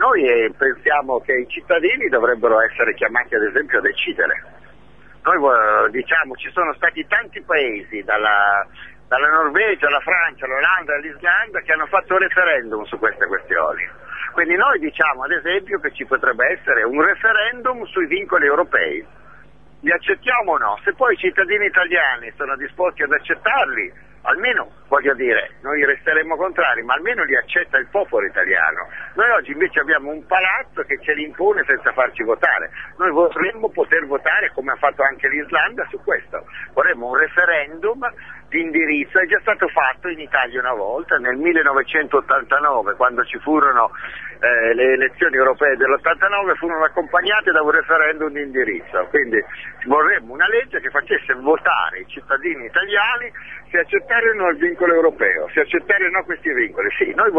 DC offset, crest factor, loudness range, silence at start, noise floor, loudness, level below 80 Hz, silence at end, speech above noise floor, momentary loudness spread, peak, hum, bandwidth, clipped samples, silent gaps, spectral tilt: 0.5%; 18 dB; 2 LU; 0 s; -48 dBFS; -17 LUFS; -54 dBFS; 0 s; 30 dB; 7 LU; 0 dBFS; none; 6.8 kHz; under 0.1%; none; -6 dB/octave